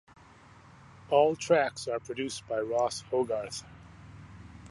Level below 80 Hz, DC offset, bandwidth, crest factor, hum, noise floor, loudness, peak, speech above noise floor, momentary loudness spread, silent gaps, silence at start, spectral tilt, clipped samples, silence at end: -62 dBFS; under 0.1%; 11.5 kHz; 22 dB; none; -55 dBFS; -30 LUFS; -10 dBFS; 26 dB; 25 LU; none; 1.1 s; -4 dB/octave; under 0.1%; 0 s